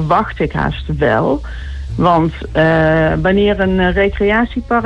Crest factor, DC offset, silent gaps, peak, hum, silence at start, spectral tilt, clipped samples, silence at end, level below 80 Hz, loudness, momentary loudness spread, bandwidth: 12 dB; under 0.1%; none; -2 dBFS; none; 0 s; -8 dB/octave; under 0.1%; 0 s; -26 dBFS; -14 LUFS; 7 LU; 8.2 kHz